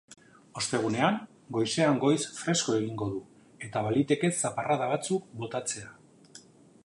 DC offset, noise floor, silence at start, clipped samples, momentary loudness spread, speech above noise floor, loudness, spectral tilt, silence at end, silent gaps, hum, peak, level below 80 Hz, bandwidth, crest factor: under 0.1%; -54 dBFS; 0.1 s; under 0.1%; 10 LU; 26 dB; -29 LUFS; -4.5 dB/octave; 0.45 s; none; none; -10 dBFS; -68 dBFS; 11.5 kHz; 20 dB